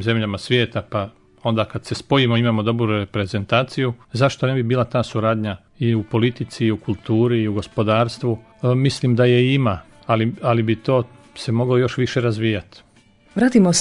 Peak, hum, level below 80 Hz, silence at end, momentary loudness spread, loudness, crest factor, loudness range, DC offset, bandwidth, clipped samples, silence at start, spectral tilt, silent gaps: -2 dBFS; none; -54 dBFS; 0 s; 9 LU; -20 LUFS; 18 dB; 2 LU; under 0.1%; 11 kHz; under 0.1%; 0 s; -6 dB/octave; none